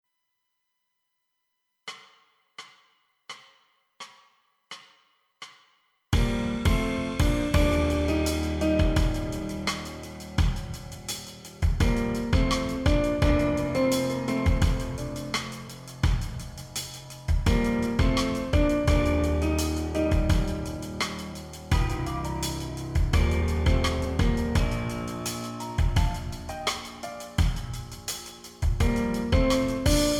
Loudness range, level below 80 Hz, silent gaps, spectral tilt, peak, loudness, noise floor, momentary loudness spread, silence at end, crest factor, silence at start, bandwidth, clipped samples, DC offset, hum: 21 LU; -30 dBFS; none; -5.5 dB/octave; -8 dBFS; -27 LUFS; -79 dBFS; 17 LU; 0 s; 18 dB; 1.85 s; 18 kHz; under 0.1%; under 0.1%; none